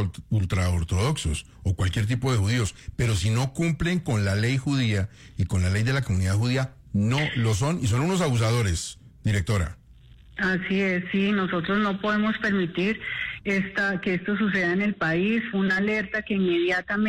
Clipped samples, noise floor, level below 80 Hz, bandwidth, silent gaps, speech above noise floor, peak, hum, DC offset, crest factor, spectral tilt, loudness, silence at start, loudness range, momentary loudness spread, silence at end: under 0.1%; -50 dBFS; -44 dBFS; 15 kHz; none; 26 dB; -14 dBFS; none; under 0.1%; 10 dB; -5.5 dB/octave; -25 LUFS; 0 s; 2 LU; 5 LU; 0 s